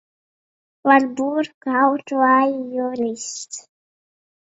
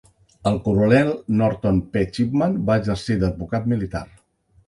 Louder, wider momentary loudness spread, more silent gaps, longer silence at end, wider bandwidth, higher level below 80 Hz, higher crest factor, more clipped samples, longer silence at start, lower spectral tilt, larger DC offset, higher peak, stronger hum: about the same, -19 LUFS vs -21 LUFS; first, 13 LU vs 8 LU; first, 1.54-1.61 s vs none; first, 1 s vs 0.65 s; second, 8 kHz vs 11.5 kHz; second, -70 dBFS vs -40 dBFS; about the same, 20 dB vs 18 dB; neither; first, 0.85 s vs 0.45 s; second, -3 dB/octave vs -8 dB/octave; neither; about the same, 0 dBFS vs -2 dBFS; neither